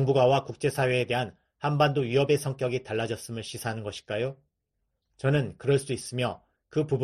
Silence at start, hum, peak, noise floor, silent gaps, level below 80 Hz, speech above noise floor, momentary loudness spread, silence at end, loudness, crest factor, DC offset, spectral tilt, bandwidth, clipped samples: 0 s; none; -10 dBFS; -80 dBFS; none; -60 dBFS; 53 dB; 10 LU; 0 s; -28 LUFS; 18 dB; under 0.1%; -6 dB/octave; 13 kHz; under 0.1%